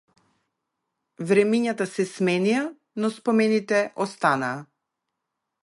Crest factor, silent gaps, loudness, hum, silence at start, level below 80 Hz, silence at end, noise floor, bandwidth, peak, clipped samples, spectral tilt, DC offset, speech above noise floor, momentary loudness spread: 20 dB; none; -23 LUFS; none; 1.2 s; -74 dBFS; 1 s; -82 dBFS; 11.5 kHz; -6 dBFS; under 0.1%; -5.5 dB/octave; under 0.1%; 59 dB; 9 LU